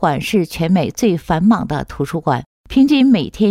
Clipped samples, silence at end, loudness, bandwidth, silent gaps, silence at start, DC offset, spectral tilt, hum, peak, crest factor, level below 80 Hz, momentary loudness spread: under 0.1%; 0 s; -16 LUFS; 15.5 kHz; 2.46-2.64 s; 0 s; under 0.1%; -6.5 dB/octave; none; -4 dBFS; 12 dB; -40 dBFS; 9 LU